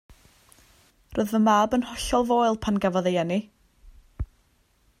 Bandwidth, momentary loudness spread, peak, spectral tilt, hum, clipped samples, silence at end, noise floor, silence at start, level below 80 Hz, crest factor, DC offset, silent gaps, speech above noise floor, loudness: 16 kHz; 18 LU; -8 dBFS; -5.5 dB/octave; none; under 0.1%; 0.75 s; -64 dBFS; 1.1 s; -46 dBFS; 18 dB; under 0.1%; none; 41 dB; -24 LUFS